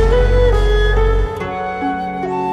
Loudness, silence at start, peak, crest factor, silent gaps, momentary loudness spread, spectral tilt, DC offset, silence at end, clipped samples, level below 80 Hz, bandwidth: -17 LUFS; 0 s; -2 dBFS; 12 dB; none; 8 LU; -7 dB/octave; under 0.1%; 0 s; under 0.1%; -16 dBFS; 7.6 kHz